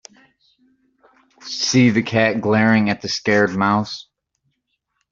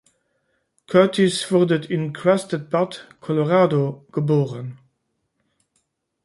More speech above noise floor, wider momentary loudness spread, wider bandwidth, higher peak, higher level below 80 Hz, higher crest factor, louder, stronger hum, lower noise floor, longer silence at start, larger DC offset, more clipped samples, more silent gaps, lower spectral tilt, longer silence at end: about the same, 56 dB vs 54 dB; first, 14 LU vs 10 LU; second, 7.6 kHz vs 11.5 kHz; about the same, -2 dBFS vs -2 dBFS; first, -58 dBFS vs -66 dBFS; about the same, 18 dB vs 20 dB; first, -17 LUFS vs -20 LUFS; neither; about the same, -73 dBFS vs -73 dBFS; first, 1.45 s vs 0.9 s; neither; neither; neither; second, -5 dB/octave vs -6.5 dB/octave; second, 1.1 s vs 1.5 s